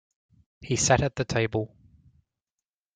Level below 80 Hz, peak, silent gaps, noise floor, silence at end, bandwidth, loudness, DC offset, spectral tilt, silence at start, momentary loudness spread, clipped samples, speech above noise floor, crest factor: -52 dBFS; -6 dBFS; none; under -90 dBFS; 1.3 s; 9.6 kHz; -25 LUFS; under 0.1%; -4 dB/octave; 0.6 s; 10 LU; under 0.1%; over 65 dB; 24 dB